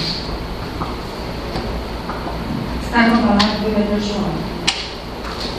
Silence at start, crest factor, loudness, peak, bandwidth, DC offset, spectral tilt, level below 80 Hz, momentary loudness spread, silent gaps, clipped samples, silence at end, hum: 0 s; 20 dB; -20 LUFS; 0 dBFS; 14 kHz; under 0.1%; -5 dB/octave; -32 dBFS; 12 LU; none; under 0.1%; 0 s; none